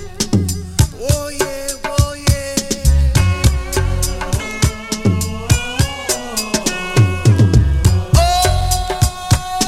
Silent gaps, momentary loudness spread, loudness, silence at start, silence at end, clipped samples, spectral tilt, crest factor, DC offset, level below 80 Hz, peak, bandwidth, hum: none; 7 LU; -16 LUFS; 0 s; 0 s; under 0.1%; -4.5 dB/octave; 14 dB; under 0.1%; -20 dBFS; 0 dBFS; 16 kHz; none